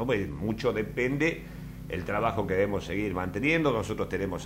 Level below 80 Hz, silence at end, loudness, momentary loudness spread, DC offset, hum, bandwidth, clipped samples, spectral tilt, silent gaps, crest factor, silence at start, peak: -46 dBFS; 0 s; -29 LUFS; 10 LU; under 0.1%; none; 16 kHz; under 0.1%; -6.5 dB/octave; none; 18 dB; 0 s; -12 dBFS